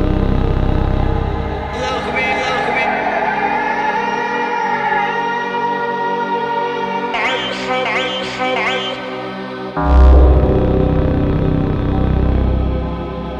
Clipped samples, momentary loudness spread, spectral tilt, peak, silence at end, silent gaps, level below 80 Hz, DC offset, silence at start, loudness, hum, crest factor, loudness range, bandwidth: under 0.1%; 7 LU; -6.5 dB/octave; 0 dBFS; 0 s; none; -20 dBFS; under 0.1%; 0 s; -17 LUFS; none; 16 dB; 4 LU; 7.6 kHz